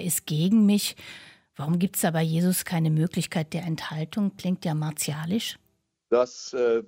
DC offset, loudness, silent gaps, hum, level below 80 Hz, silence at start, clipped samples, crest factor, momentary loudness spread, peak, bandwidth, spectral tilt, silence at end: under 0.1%; -26 LUFS; none; none; -66 dBFS; 0 s; under 0.1%; 16 dB; 9 LU; -10 dBFS; 16 kHz; -5.5 dB/octave; 0 s